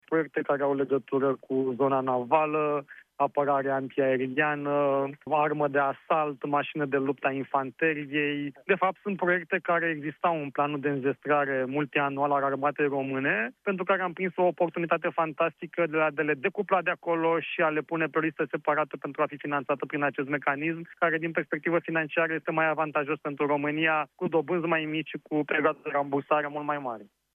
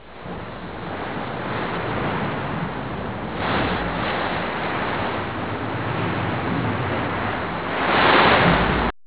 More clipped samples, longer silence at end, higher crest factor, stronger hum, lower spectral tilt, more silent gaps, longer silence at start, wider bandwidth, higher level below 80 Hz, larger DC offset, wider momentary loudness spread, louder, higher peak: neither; first, 0.3 s vs 0.15 s; about the same, 20 dB vs 20 dB; neither; about the same, -8.5 dB/octave vs -9.5 dB/octave; neither; about the same, 0.1 s vs 0 s; about the same, 3.8 kHz vs 4 kHz; second, -78 dBFS vs -38 dBFS; second, under 0.1% vs 0.7%; second, 5 LU vs 13 LU; second, -28 LUFS vs -22 LUFS; second, -8 dBFS vs -2 dBFS